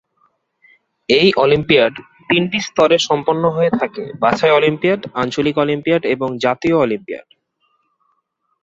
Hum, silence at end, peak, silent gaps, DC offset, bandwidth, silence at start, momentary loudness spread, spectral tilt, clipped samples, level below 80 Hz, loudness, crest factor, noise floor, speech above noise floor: none; 1.45 s; 0 dBFS; none; under 0.1%; 7.8 kHz; 1.1 s; 8 LU; -5 dB/octave; under 0.1%; -52 dBFS; -16 LUFS; 16 dB; -68 dBFS; 52 dB